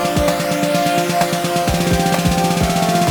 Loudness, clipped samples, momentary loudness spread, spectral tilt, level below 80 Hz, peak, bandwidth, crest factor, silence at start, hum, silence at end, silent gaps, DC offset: -16 LUFS; under 0.1%; 2 LU; -4.5 dB/octave; -32 dBFS; -2 dBFS; over 20 kHz; 14 dB; 0 s; none; 0 s; none; under 0.1%